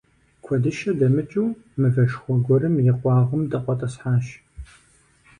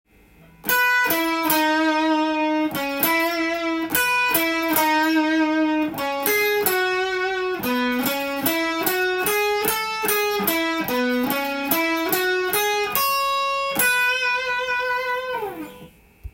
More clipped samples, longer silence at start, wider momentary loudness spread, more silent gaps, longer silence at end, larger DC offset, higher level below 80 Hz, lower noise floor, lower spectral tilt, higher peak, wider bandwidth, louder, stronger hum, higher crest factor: neither; second, 0.45 s vs 0.65 s; about the same, 7 LU vs 5 LU; neither; first, 0.75 s vs 0.05 s; neither; about the same, -50 dBFS vs -54 dBFS; first, -57 dBFS vs -51 dBFS; first, -9 dB/octave vs -2.5 dB/octave; second, -8 dBFS vs -2 dBFS; second, 9.6 kHz vs 17 kHz; about the same, -22 LUFS vs -20 LUFS; neither; second, 14 dB vs 20 dB